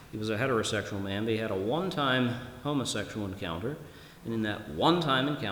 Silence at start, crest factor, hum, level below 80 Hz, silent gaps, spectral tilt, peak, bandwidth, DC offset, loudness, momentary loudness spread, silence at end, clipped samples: 0 s; 20 dB; none; -58 dBFS; none; -5 dB/octave; -12 dBFS; over 20 kHz; under 0.1%; -30 LUFS; 10 LU; 0 s; under 0.1%